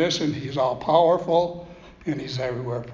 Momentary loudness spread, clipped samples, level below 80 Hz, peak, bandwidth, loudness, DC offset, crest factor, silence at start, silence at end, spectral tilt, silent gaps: 12 LU; under 0.1%; -54 dBFS; -4 dBFS; 7.6 kHz; -23 LUFS; under 0.1%; 18 dB; 0 s; 0 s; -5.5 dB/octave; none